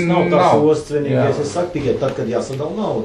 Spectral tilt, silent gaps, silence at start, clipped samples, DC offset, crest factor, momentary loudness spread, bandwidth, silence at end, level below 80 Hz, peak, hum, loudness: -6.5 dB/octave; none; 0 s; under 0.1%; under 0.1%; 16 dB; 9 LU; 11.5 kHz; 0 s; -46 dBFS; -2 dBFS; none; -17 LUFS